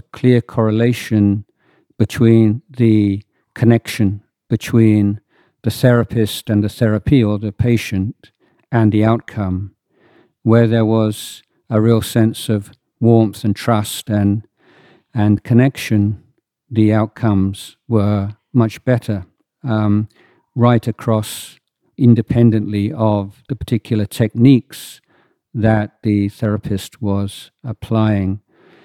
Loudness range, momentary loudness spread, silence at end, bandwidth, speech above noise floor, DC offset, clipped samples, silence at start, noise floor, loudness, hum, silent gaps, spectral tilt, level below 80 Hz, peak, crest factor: 3 LU; 13 LU; 0.45 s; 14.5 kHz; 43 dB; under 0.1%; under 0.1%; 0.15 s; -58 dBFS; -16 LUFS; none; none; -7.5 dB/octave; -46 dBFS; 0 dBFS; 16 dB